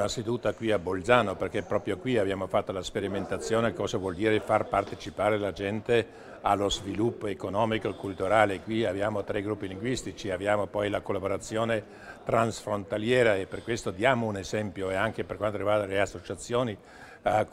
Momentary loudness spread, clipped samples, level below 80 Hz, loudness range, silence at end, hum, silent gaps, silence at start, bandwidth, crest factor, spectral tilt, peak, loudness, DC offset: 9 LU; under 0.1%; -54 dBFS; 2 LU; 0 s; none; none; 0 s; 14.5 kHz; 24 dB; -5 dB/octave; -4 dBFS; -29 LUFS; under 0.1%